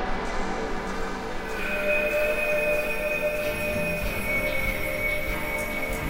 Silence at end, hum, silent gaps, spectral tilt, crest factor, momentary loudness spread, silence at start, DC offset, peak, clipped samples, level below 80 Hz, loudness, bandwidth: 0 s; none; none; -4.5 dB/octave; 14 dB; 7 LU; 0 s; under 0.1%; -12 dBFS; under 0.1%; -36 dBFS; -26 LUFS; 16.5 kHz